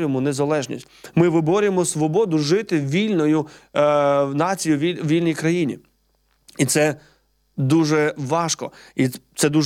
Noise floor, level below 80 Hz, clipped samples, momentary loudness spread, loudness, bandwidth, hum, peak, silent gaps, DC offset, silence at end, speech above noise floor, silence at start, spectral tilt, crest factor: -64 dBFS; -62 dBFS; under 0.1%; 9 LU; -20 LUFS; 16.5 kHz; none; -4 dBFS; none; under 0.1%; 0 s; 45 dB; 0 s; -5.5 dB/octave; 16 dB